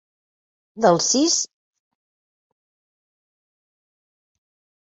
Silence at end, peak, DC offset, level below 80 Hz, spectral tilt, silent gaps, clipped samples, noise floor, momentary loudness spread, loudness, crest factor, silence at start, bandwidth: 3.4 s; -2 dBFS; under 0.1%; -70 dBFS; -3 dB/octave; none; under 0.1%; under -90 dBFS; 6 LU; -18 LUFS; 24 dB; 0.75 s; 8.2 kHz